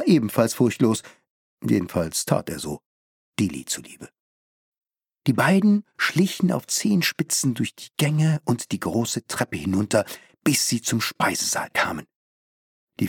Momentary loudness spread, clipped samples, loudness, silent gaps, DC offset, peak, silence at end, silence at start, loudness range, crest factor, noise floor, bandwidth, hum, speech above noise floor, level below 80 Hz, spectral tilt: 10 LU; under 0.1%; -23 LUFS; 1.30-1.58 s, 2.86-3.33 s, 4.20-4.72 s, 12.16-12.88 s; under 0.1%; -2 dBFS; 0 s; 0 s; 5 LU; 22 dB; under -90 dBFS; 19 kHz; none; over 67 dB; -58 dBFS; -4.5 dB/octave